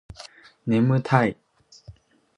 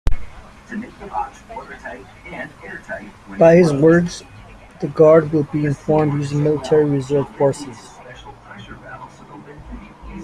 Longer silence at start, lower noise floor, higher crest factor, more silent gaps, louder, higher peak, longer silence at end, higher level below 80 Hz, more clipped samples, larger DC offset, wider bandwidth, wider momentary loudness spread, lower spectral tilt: first, 0.2 s vs 0.05 s; first, -49 dBFS vs -41 dBFS; first, 24 dB vs 18 dB; neither; second, -22 LUFS vs -16 LUFS; about the same, -2 dBFS vs -2 dBFS; first, 0.45 s vs 0 s; second, -56 dBFS vs -36 dBFS; neither; neither; about the same, 10 kHz vs 11 kHz; second, 23 LU vs 26 LU; about the same, -8 dB/octave vs -7.5 dB/octave